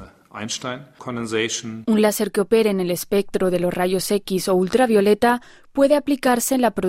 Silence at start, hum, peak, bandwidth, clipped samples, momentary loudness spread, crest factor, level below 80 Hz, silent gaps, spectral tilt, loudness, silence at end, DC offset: 0 s; none; -4 dBFS; 16 kHz; under 0.1%; 12 LU; 16 dB; -52 dBFS; none; -4.5 dB/octave; -20 LUFS; 0 s; under 0.1%